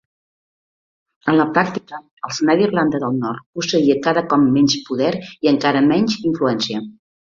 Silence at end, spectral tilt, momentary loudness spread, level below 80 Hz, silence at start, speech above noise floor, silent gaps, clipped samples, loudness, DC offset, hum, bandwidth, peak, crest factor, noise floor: 0.45 s; -5 dB/octave; 11 LU; -58 dBFS; 1.25 s; over 73 dB; 2.11-2.17 s, 3.46-3.53 s; under 0.1%; -18 LUFS; under 0.1%; none; 7.4 kHz; -2 dBFS; 16 dB; under -90 dBFS